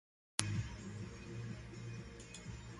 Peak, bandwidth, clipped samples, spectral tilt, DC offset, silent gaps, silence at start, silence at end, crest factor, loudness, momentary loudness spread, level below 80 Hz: -6 dBFS; 11.5 kHz; under 0.1%; -4 dB/octave; under 0.1%; none; 0.4 s; 0 s; 38 dB; -45 LUFS; 11 LU; -58 dBFS